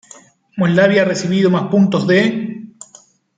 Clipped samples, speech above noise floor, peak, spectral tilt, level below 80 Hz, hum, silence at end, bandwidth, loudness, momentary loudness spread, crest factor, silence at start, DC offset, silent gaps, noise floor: under 0.1%; 34 dB; -2 dBFS; -6.5 dB/octave; -60 dBFS; none; 0.7 s; 9.2 kHz; -14 LUFS; 18 LU; 14 dB; 0.55 s; under 0.1%; none; -48 dBFS